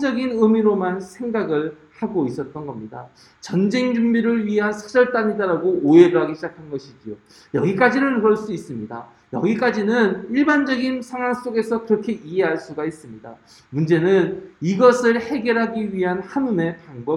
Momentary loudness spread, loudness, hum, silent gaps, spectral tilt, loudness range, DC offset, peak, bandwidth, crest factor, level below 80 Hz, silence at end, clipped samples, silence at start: 17 LU; -20 LUFS; none; none; -7 dB/octave; 5 LU; under 0.1%; 0 dBFS; 11.5 kHz; 20 dB; -62 dBFS; 0 s; under 0.1%; 0 s